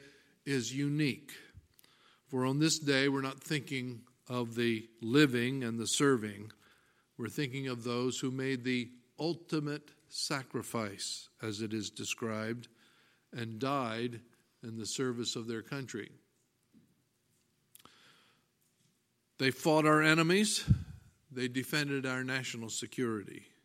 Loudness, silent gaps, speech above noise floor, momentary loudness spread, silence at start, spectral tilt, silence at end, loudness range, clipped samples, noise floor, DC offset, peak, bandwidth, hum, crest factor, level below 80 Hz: -34 LUFS; none; 43 dB; 16 LU; 0 s; -4.5 dB/octave; 0.2 s; 10 LU; under 0.1%; -76 dBFS; under 0.1%; -10 dBFS; 16.5 kHz; none; 26 dB; -60 dBFS